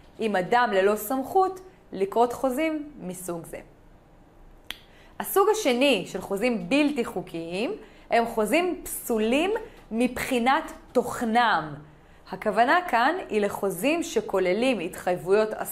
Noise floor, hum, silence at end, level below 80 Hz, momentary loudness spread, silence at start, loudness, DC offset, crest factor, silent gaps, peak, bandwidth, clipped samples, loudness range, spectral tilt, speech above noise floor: -53 dBFS; none; 0 s; -54 dBFS; 14 LU; 0.2 s; -25 LUFS; under 0.1%; 16 dB; none; -10 dBFS; 16 kHz; under 0.1%; 5 LU; -4 dB/octave; 28 dB